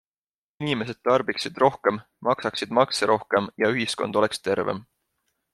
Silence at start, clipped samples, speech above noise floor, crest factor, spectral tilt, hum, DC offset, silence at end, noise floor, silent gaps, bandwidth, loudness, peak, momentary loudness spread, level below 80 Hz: 0.6 s; under 0.1%; over 66 dB; 20 dB; -4.5 dB/octave; none; under 0.1%; 0.7 s; under -90 dBFS; none; 13 kHz; -24 LUFS; -4 dBFS; 7 LU; -66 dBFS